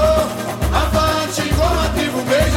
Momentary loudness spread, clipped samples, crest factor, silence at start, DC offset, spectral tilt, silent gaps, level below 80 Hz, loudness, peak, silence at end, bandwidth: 4 LU; under 0.1%; 14 dB; 0 s; under 0.1%; -5 dB/octave; none; -24 dBFS; -17 LUFS; -2 dBFS; 0 s; 17 kHz